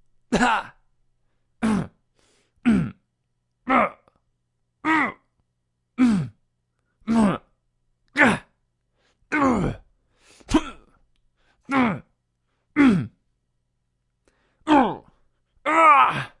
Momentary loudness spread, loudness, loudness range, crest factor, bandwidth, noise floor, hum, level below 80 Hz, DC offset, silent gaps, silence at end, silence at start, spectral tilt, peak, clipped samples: 18 LU; -21 LUFS; 3 LU; 24 dB; 11.5 kHz; -74 dBFS; none; -48 dBFS; under 0.1%; none; 0.15 s; 0.3 s; -6 dB/octave; 0 dBFS; under 0.1%